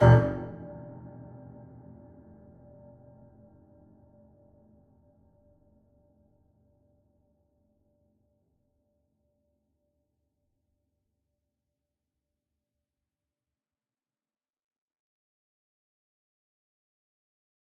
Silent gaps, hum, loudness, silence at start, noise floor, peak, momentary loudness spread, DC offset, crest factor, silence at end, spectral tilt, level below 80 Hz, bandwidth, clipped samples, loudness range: none; none; -27 LUFS; 0 s; under -90 dBFS; -6 dBFS; 26 LU; under 0.1%; 28 dB; 16.85 s; -6.5 dB/octave; -52 dBFS; 3.1 kHz; under 0.1%; 21 LU